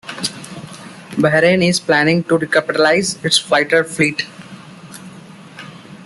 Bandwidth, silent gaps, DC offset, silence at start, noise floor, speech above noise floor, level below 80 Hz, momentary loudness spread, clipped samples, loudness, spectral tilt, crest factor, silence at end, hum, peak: 12.5 kHz; none; under 0.1%; 0.05 s; -38 dBFS; 23 dB; -56 dBFS; 22 LU; under 0.1%; -15 LUFS; -4 dB/octave; 16 dB; 0 s; none; 0 dBFS